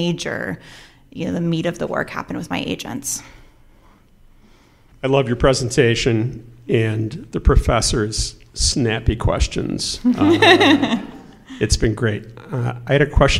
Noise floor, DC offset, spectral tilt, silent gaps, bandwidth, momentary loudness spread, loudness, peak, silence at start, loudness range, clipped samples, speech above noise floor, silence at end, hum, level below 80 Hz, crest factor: -50 dBFS; under 0.1%; -4.5 dB/octave; none; 15.5 kHz; 12 LU; -19 LUFS; 0 dBFS; 0 s; 9 LU; under 0.1%; 32 dB; 0 s; none; -28 dBFS; 18 dB